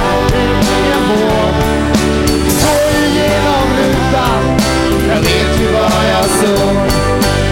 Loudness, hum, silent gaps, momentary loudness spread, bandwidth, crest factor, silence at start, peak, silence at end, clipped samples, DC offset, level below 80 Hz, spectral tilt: -11 LUFS; none; none; 1 LU; 17 kHz; 10 dB; 0 s; 0 dBFS; 0 s; under 0.1%; under 0.1%; -22 dBFS; -5 dB/octave